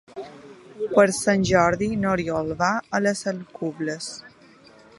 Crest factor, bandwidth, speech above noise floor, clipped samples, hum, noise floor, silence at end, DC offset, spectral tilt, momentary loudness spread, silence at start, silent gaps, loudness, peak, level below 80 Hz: 20 dB; 11.5 kHz; 29 dB; under 0.1%; none; -51 dBFS; 0.7 s; under 0.1%; -5 dB/octave; 16 LU; 0.15 s; none; -23 LUFS; -4 dBFS; -50 dBFS